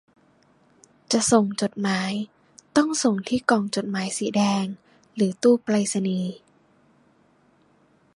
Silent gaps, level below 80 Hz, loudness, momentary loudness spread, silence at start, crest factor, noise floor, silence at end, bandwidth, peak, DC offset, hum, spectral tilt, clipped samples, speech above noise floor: none; -66 dBFS; -23 LUFS; 11 LU; 1.1 s; 22 dB; -61 dBFS; 1.8 s; 11.5 kHz; -4 dBFS; under 0.1%; none; -4.5 dB/octave; under 0.1%; 38 dB